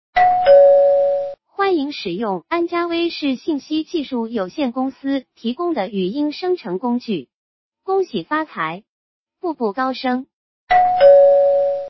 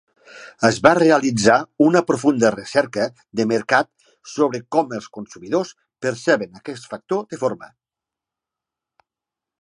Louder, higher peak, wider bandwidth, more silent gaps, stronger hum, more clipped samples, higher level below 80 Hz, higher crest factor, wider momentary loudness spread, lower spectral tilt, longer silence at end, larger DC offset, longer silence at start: about the same, -18 LUFS vs -19 LUFS; about the same, -2 dBFS vs 0 dBFS; second, 6 kHz vs 11 kHz; first, 7.34-7.72 s, 8.89-9.26 s, 10.33-10.67 s vs none; neither; neither; about the same, -56 dBFS vs -60 dBFS; about the same, 16 dB vs 20 dB; second, 14 LU vs 17 LU; first, -6.5 dB/octave vs -5 dB/octave; second, 0 s vs 1.95 s; neither; second, 0.15 s vs 0.35 s